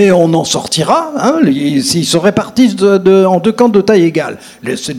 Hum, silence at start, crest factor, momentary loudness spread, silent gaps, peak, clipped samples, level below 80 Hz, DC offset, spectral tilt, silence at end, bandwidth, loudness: none; 0 s; 10 dB; 7 LU; none; 0 dBFS; 0.8%; -50 dBFS; under 0.1%; -5 dB/octave; 0 s; 15 kHz; -10 LUFS